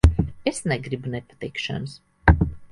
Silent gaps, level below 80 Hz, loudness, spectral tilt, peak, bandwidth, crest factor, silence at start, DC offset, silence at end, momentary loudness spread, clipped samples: none; -26 dBFS; -24 LUFS; -6 dB/octave; 0 dBFS; 11.5 kHz; 22 dB; 0.05 s; under 0.1%; 0.05 s; 13 LU; under 0.1%